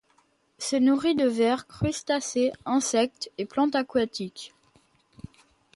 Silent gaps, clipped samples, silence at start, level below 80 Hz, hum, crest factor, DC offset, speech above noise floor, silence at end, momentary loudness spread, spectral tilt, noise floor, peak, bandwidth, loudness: none; under 0.1%; 0.6 s; -56 dBFS; none; 16 dB; under 0.1%; 41 dB; 1.3 s; 12 LU; -4.5 dB/octave; -66 dBFS; -12 dBFS; 11.5 kHz; -26 LUFS